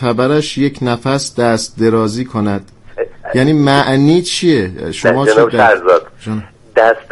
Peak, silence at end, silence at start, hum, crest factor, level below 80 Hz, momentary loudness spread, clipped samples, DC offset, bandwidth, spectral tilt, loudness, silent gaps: 0 dBFS; 0.1 s; 0 s; none; 12 dB; -44 dBFS; 14 LU; under 0.1%; under 0.1%; 12 kHz; -5.5 dB/octave; -12 LUFS; none